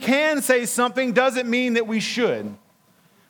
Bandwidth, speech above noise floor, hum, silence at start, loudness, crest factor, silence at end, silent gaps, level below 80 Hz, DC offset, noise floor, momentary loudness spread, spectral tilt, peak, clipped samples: 19.5 kHz; 38 dB; none; 0 s; -21 LUFS; 18 dB; 0.75 s; none; -80 dBFS; under 0.1%; -59 dBFS; 5 LU; -3 dB/octave; -4 dBFS; under 0.1%